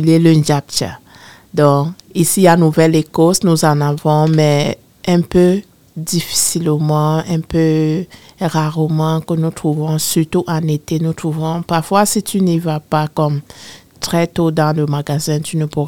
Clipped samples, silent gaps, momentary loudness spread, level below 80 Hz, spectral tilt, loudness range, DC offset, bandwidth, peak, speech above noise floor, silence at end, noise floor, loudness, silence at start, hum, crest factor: under 0.1%; none; 9 LU; -46 dBFS; -5.5 dB/octave; 4 LU; 0.5%; 17.5 kHz; 0 dBFS; 27 dB; 0 s; -41 dBFS; -15 LUFS; 0 s; none; 14 dB